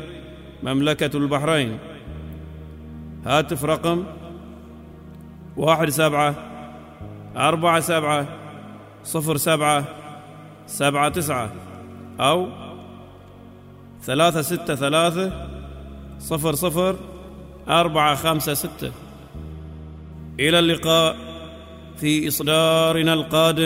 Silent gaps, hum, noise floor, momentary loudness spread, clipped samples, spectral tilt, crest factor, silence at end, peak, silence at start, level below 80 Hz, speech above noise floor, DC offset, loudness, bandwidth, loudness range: none; none; -43 dBFS; 22 LU; under 0.1%; -4.5 dB/octave; 20 dB; 0 s; -2 dBFS; 0 s; -46 dBFS; 23 dB; under 0.1%; -20 LUFS; 16 kHz; 4 LU